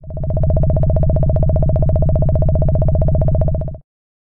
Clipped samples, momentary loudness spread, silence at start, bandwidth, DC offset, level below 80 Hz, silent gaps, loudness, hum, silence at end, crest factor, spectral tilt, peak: under 0.1%; 4 LU; 0.05 s; 2 kHz; under 0.1%; -18 dBFS; none; -16 LUFS; 60 Hz at -55 dBFS; 0.5 s; 8 dB; -14 dB/octave; -6 dBFS